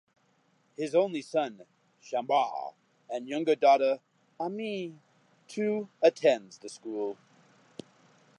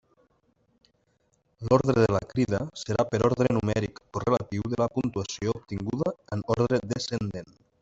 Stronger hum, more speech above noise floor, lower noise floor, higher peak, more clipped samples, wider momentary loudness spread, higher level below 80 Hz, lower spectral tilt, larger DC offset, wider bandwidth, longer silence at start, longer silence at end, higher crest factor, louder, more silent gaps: neither; about the same, 41 dB vs 44 dB; about the same, -69 dBFS vs -70 dBFS; second, -10 dBFS vs -6 dBFS; neither; first, 21 LU vs 9 LU; second, -88 dBFS vs -54 dBFS; second, -5 dB/octave vs -6.5 dB/octave; neither; first, 11 kHz vs 8 kHz; second, 0.8 s vs 1.6 s; first, 1.25 s vs 0.35 s; about the same, 20 dB vs 22 dB; about the same, -29 LUFS vs -27 LUFS; neither